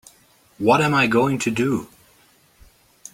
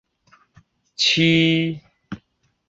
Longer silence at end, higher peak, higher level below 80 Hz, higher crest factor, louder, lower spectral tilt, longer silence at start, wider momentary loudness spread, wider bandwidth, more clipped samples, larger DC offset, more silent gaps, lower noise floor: first, 1.3 s vs 0.5 s; first, -2 dBFS vs -6 dBFS; about the same, -56 dBFS vs -58 dBFS; about the same, 20 dB vs 16 dB; about the same, -19 LUFS vs -17 LUFS; about the same, -5.5 dB/octave vs -4.5 dB/octave; second, 0.6 s vs 1 s; second, 7 LU vs 23 LU; first, 16.5 kHz vs 7.8 kHz; neither; neither; neither; second, -56 dBFS vs -64 dBFS